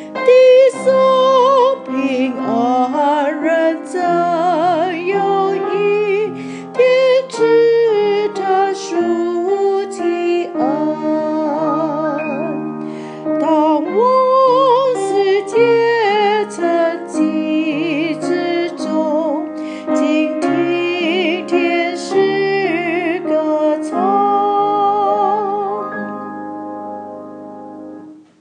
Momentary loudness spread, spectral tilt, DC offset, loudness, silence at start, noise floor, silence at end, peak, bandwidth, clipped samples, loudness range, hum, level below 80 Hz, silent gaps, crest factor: 12 LU; -5 dB/octave; under 0.1%; -15 LUFS; 0 s; -36 dBFS; 0.25 s; 0 dBFS; 10 kHz; under 0.1%; 4 LU; none; -78 dBFS; none; 14 dB